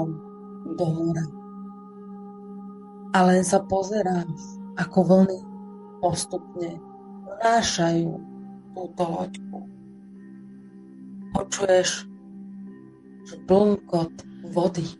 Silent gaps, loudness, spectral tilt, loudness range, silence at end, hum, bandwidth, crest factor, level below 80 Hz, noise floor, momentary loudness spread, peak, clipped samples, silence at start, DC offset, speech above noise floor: none; -24 LUFS; -5.5 dB/octave; 7 LU; 0.05 s; none; 11.5 kHz; 20 dB; -56 dBFS; -46 dBFS; 24 LU; -6 dBFS; under 0.1%; 0 s; under 0.1%; 23 dB